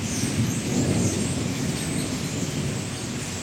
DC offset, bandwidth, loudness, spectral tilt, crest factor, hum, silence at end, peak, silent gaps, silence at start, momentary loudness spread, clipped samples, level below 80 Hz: under 0.1%; 16.5 kHz; -26 LUFS; -4.5 dB/octave; 16 dB; none; 0 s; -10 dBFS; none; 0 s; 6 LU; under 0.1%; -46 dBFS